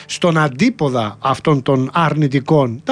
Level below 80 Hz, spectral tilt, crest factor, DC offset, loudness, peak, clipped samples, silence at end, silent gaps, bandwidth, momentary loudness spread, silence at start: -52 dBFS; -6.5 dB/octave; 14 dB; under 0.1%; -16 LUFS; -2 dBFS; under 0.1%; 0 s; none; 10.5 kHz; 4 LU; 0 s